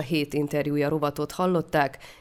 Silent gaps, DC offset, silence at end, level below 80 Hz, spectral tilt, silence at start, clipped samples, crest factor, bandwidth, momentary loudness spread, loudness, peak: none; under 0.1%; 0.05 s; -56 dBFS; -6.5 dB/octave; 0 s; under 0.1%; 16 dB; 17 kHz; 4 LU; -26 LUFS; -10 dBFS